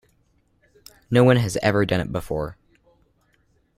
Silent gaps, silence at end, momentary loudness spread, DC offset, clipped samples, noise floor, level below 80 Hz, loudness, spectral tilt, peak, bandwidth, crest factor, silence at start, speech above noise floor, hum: none; 1.25 s; 12 LU; under 0.1%; under 0.1%; -64 dBFS; -48 dBFS; -21 LUFS; -6.5 dB/octave; -2 dBFS; 15 kHz; 22 dB; 1.1 s; 44 dB; none